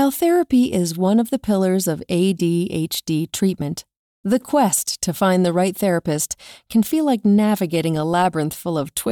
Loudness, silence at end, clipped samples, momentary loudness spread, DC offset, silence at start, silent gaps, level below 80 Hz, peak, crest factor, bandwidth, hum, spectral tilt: -19 LUFS; 0 s; under 0.1%; 7 LU; under 0.1%; 0 s; 3.99-4.23 s; -54 dBFS; -6 dBFS; 14 dB; over 20 kHz; none; -5 dB/octave